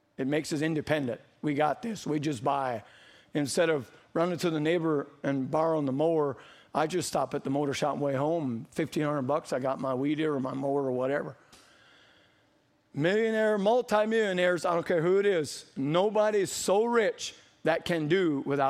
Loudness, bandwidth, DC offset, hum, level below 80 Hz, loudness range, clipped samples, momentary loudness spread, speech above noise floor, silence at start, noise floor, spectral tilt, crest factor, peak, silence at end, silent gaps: -29 LUFS; 15.5 kHz; under 0.1%; none; -68 dBFS; 4 LU; under 0.1%; 8 LU; 39 dB; 0.2 s; -68 dBFS; -5.5 dB/octave; 18 dB; -10 dBFS; 0 s; none